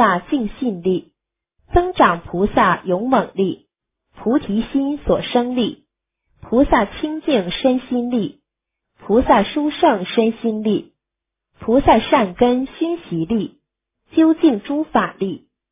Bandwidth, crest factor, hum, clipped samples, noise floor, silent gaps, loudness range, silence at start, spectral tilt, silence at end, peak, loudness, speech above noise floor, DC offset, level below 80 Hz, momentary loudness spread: 3.9 kHz; 18 dB; none; under 0.1%; -83 dBFS; none; 3 LU; 0 s; -10.5 dB/octave; 0.35 s; 0 dBFS; -18 LUFS; 66 dB; under 0.1%; -38 dBFS; 9 LU